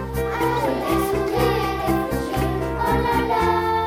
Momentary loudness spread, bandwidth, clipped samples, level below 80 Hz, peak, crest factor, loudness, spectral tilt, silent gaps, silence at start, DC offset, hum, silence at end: 4 LU; 18 kHz; under 0.1%; -34 dBFS; -6 dBFS; 14 dB; -21 LUFS; -6 dB/octave; none; 0 s; under 0.1%; none; 0 s